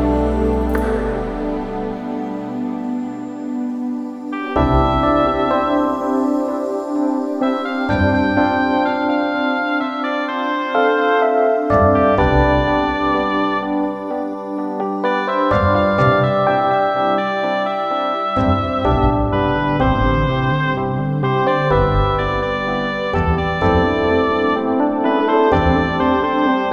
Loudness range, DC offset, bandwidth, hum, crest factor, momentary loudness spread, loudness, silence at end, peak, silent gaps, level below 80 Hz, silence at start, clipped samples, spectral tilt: 4 LU; under 0.1%; 10.5 kHz; none; 14 dB; 9 LU; -17 LUFS; 0 s; -2 dBFS; none; -30 dBFS; 0 s; under 0.1%; -8 dB/octave